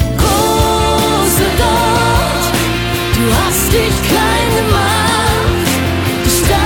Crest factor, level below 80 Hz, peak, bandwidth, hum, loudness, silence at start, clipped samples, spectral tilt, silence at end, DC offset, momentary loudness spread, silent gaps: 12 dB; -22 dBFS; 0 dBFS; 19 kHz; none; -12 LUFS; 0 s; under 0.1%; -4 dB/octave; 0 s; under 0.1%; 3 LU; none